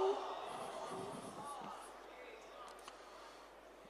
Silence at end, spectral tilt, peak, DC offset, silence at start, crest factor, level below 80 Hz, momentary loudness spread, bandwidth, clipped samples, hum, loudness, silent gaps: 0 s; -4 dB/octave; -24 dBFS; under 0.1%; 0 s; 22 dB; -76 dBFS; 11 LU; 15 kHz; under 0.1%; none; -48 LUFS; none